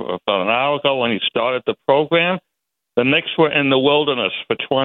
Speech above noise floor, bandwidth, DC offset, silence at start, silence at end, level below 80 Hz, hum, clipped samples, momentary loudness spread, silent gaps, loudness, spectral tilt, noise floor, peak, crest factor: 61 dB; 4.2 kHz; under 0.1%; 0 s; 0 s; -60 dBFS; none; under 0.1%; 6 LU; none; -17 LUFS; -8.5 dB/octave; -79 dBFS; -2 dBFS; 16 dB